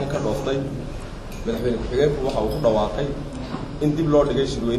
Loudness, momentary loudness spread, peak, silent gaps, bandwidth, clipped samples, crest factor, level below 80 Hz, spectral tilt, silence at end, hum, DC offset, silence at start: -23 LUFS; 12 LU; -6 dBFS; none; 13.5 kHz; under 0.1%; 16 dB; -34 dBFS; -6.5 dB/octave; 0 s; none; under 0.1%; 0 s